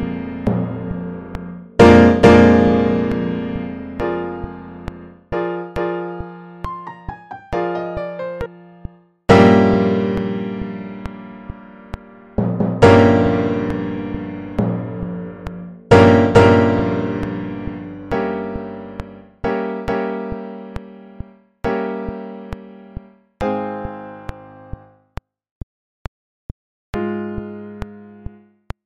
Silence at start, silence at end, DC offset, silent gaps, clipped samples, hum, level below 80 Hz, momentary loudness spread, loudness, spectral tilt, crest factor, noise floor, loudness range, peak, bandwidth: 0 s; 0.65 s; 0.1%; 25.51-26.93 s; under 0.1%; none; -38 dBFS; 26 LU; -17 LUFS; -7.5 dB/octave; 18 dB; -37 dBFS; 16 LU; 0 dBFS; 10 kHz